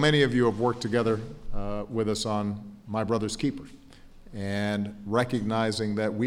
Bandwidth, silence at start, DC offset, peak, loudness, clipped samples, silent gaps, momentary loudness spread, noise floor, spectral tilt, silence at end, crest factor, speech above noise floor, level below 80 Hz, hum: 14 kHz; 0 s; under 0.1%; -8 dBFS; -28 LUFS; under 0.1%; none; 13 LU; -49 dBFS; -5.5 dB/octave; 0 s; 18 dB; 22 dB; -44 dBFS; none